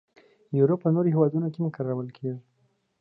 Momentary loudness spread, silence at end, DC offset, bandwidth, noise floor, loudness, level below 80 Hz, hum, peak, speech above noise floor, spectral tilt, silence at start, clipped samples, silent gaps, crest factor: 13 LU; 0.6 s; under 0.1%; 4.8 kHz; -70 dBFS; -26 LUFS; -74 dBFS; none; -8 dBFS; 45 dB; -12.5 dB/octave; 0.5 s; under 0.1%; none; 18 dB